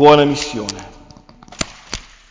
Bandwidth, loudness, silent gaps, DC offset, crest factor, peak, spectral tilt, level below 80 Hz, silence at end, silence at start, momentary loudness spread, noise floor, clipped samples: 7.8 kHz; -18 LUFS; none; under 0.1%; 16 dB; 0 dBFS; -4.5 dB/octave; -42 dBFS; 0.3 s; 0 s; 24 LU; -43 dBFS; under 0.1%